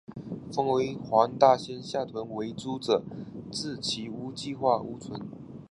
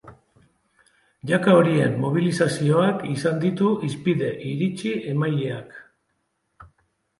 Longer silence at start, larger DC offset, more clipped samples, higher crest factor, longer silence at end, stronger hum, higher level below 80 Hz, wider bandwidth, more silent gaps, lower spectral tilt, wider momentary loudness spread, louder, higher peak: about the same, 0.1 s vs 0.05 s; neither; neither; about the same, 24 dB vs 20 dB; second, 0.05 s vs 0.55 s; neither; about the same, -64 dBFS vs -62 dBFS; about the same, 11.5 kHz vs 11.5 kHz; neither; second, -5 dB/octave vs -7 dB/octave; first, 18 LU vs 10 LU; second, -29 LUFS vs -22 LUFS; second, -6 dBFS vs -2 dBFS